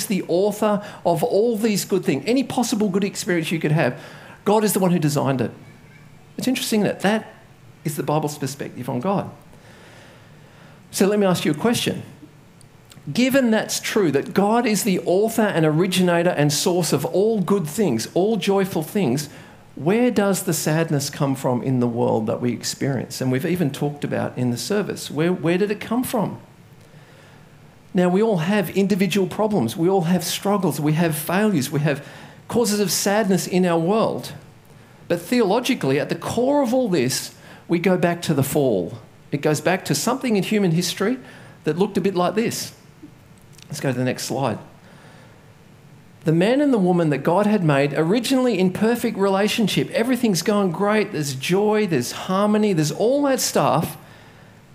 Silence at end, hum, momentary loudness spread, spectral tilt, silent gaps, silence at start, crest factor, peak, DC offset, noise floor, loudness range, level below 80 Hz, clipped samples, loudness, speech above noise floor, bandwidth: 0.65 s; none; 8 LU; -5 dB/octave; none; 0 s; 18 dB; -2 dBFS; under 0.1%; -48 dBFS; 5 LU; -60 dBFS; under 0.1%; -21 LUFS; 28 dB; 16 kHz